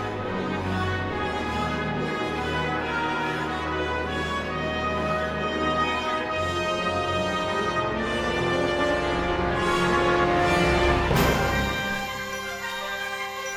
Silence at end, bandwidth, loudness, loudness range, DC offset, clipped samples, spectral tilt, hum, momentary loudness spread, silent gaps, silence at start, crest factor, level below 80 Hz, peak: 0 s; over 20 kHz; -25 LUFS; 5 LU; under 0.1%; under 0.1%; -5 dB/octave; none; 8 LU; none; 0 s; 18 dB; -38 dBFS; -8 dBFS